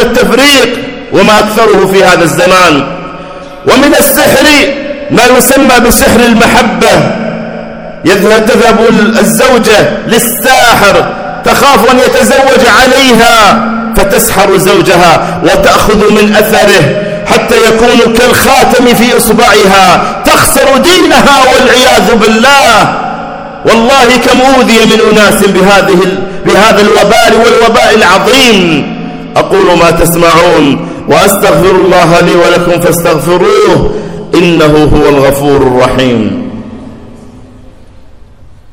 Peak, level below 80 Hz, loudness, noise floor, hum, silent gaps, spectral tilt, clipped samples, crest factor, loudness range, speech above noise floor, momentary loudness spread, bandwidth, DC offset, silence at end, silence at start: 0 dBFS; -26 dBFS; -4 LUFS; -31 dBFS; none; none; -4 dB/octave; 20%; 4 dB; 2 LU; 27 dB; 8 LU; over 20 kHz; under 0.1%; 0.55 s; 0 s